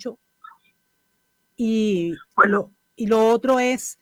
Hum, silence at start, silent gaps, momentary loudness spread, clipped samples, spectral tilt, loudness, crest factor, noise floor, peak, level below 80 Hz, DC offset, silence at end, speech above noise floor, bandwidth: none; 0 s; none; 11 LU; under 0.1%; -5 dB/octave; -20 LUFS; 20 dB; -69 dBFS; -2 dBFS; -62 dBFS; under 0.1%; 0.1 s; 50 dB; 16.5 kHz